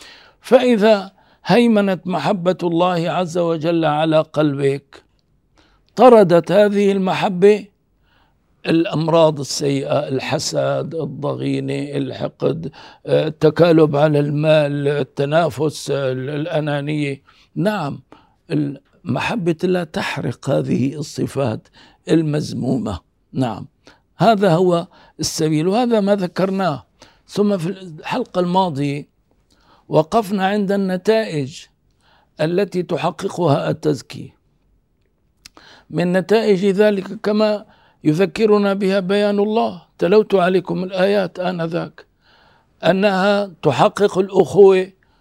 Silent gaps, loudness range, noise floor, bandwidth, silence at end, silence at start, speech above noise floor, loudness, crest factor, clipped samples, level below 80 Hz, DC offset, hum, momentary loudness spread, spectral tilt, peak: none; 6 LU; -63 dBFS; 15 kHz; 0.3 s; 0.05 s; 46 dB; -17 LUFS; 18 dB; under 0.1%; -58 dBFS; under 0.1%; none; 12 LU; -6.5 dB/octave; 0 dBFS